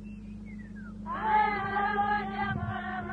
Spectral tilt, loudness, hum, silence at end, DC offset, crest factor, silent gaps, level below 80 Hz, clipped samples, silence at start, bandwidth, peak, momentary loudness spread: -7.5 dB/octave; -30 LUFS; none; 0 s; under 0.1%; 18 dB; none; -50 dBFS; under 0.1%; 0 s; 4.9 kHz; -14 dBFS; 17 LU